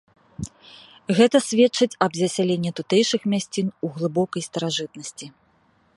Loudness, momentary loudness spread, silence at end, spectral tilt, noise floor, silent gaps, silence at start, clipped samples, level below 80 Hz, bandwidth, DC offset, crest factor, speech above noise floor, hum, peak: -22 LUFS; 19 LU; 0.65 s; -4.5 dB/octave; -61 dBFS; none; 0.4 s; under 0.1%; -58 dBFS; 11.5 kHz; under 0.1%; 20 dB; 40 dB; none; -2 dBFS